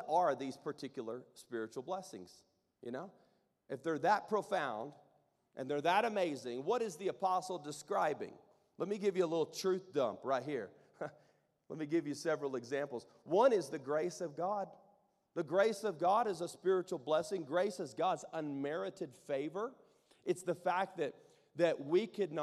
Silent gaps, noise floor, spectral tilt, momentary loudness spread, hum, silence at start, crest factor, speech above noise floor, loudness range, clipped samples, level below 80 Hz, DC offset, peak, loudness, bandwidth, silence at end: none; -74 dBFS; -5 dB/octave; 15 LU; none; 0 s; 20 dB; 37 dB; 4 LU; under 0.1%; -88 dBFS; under 0.1%; -18 dBFS; -37 LUFS; 13.5 kHz; 0 s